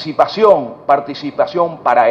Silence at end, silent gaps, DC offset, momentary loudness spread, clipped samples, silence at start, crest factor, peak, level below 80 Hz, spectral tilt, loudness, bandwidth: 0 s; none; under 0.1%; 7 LU; under 0.1%; 0 s; 14 dB; 0 dBFS; -58 dBFS; -6 dB/octave; -14 LUFS; 7.2 kHz